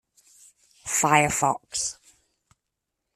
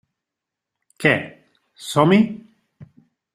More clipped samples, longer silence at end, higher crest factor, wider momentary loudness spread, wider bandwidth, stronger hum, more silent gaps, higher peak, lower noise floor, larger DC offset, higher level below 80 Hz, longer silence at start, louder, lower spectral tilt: neither; first, 1.25 s vs 0.5 s; about the same, 24 dB vs 22 dB; second, 11 LU vs 21 LU; about the same, 14.5 kHz vs 13.5 kHz; neither; neither; second, -4 dBFS vs 0 dBFS; about the same, -83 dBFS vs -85 dBFS; neither; about the same, -60 dBFS vs -60 dBFS; second, 0.85 s vs 1 s; second, -23 LUFS vs -18 LUFS; second, -2.5 dB/octave vs -6 dB/octave